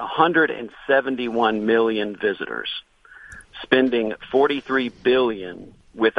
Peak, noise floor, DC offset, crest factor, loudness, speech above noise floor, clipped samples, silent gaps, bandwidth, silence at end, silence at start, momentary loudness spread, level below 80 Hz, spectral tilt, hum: 0 dBFS; -44 dBFS; under 0.1%; 20 dB; -21 LUFS; 23 dB; under 0.1%; none; 11 kHz; 0 s; 0 s; 16 LU; -56 dBFS; -6 dB/octave; none